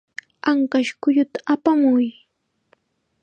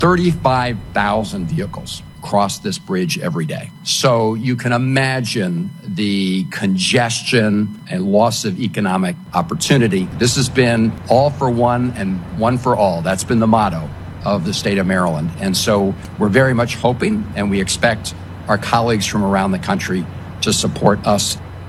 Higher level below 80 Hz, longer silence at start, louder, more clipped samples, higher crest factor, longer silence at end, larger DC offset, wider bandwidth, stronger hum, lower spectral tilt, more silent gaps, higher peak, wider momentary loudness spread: second, -70 dBFS vs -42 dBFS; first, 0.45 s vs 0 s; second, -20 LUFS vs -17 LUFS; neither; about the same, 18 dB vs 16 dB; first, 1.1 s vs 0 s; neither; second, 8.8 kHz vs 13.5 kHz; neither; about the same, -5 dB/octave vs -5 dB/octave; neither; second, -4 dBFS vs 0 dBFS; about the same, 9 LU vs 8 LU